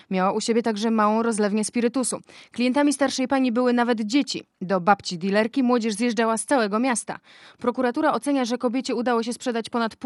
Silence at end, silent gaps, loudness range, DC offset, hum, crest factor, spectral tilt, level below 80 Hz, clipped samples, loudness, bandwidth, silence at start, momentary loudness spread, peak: 0 s; none; 2 LU; under 0.1%; none; 20 dB; -4.5 dB/octave; -72 dBFS; under 0.1%; -23 LUFS; 12 kHz; 0.1 s; 7 LU; -4 dBFS